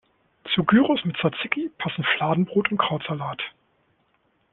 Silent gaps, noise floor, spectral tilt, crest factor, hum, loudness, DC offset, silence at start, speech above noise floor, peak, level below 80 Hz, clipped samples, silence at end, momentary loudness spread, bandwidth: none; -67 dBFS; -9.5 dB/octave; 22 dB; none; -23 LUFS; under 0.1%; 0.45 s; 44 dB; -2 dBFS; -62 dBFS; under 0.1%; 1.05 s; 12 LU; 4.2 kHz